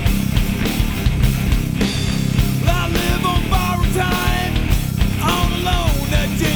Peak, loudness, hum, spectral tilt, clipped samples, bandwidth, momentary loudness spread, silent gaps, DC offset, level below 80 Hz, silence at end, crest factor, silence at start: -4 dBFS; -18 LUFS; none; -5 dB/octave; under 0.1%; over 20 kHz; 2 LU; none; under 0.1%; -22 dBFS; 0 s; 12 dB; 0 s